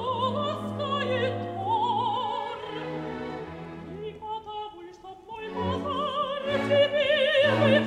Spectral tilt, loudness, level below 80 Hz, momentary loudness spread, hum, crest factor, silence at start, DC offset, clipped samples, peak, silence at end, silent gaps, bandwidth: -6 dB/octave; -27 LUFS; -60 dBFS; 17 LU; none; 18 dB; 0 s; under 0.1%; under 0.1%; -10 dBFS; 0 s; none; 10.5 kHz